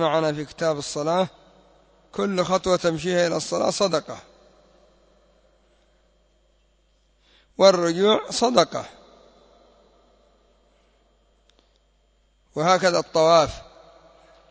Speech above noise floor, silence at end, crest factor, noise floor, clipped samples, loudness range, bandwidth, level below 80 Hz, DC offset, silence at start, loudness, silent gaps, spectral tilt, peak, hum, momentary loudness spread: 42 dB; 0.9 s; 22 dB; -63 dBFS; under 0.1%; 7 LU; 8 kHz; -56 dBFS; under 0.1%; 0 s; -21 LUFS; none; -4 dB/octave; -4 dBFS; none; 17 LU